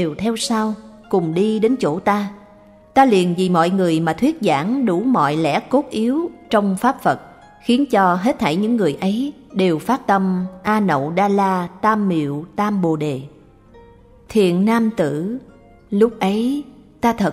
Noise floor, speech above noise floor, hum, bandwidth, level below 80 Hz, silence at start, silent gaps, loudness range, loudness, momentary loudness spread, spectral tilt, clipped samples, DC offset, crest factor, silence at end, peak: -46 dBFS; 29 dB; none; 15 kHz; -52 dBFS; 0 s; none; 3 LU; -18 LUFS; 7 LU; -6.5 dB/octave; under 0.1%; under 0.1%; 18 dB; 0 s; 0 dBFS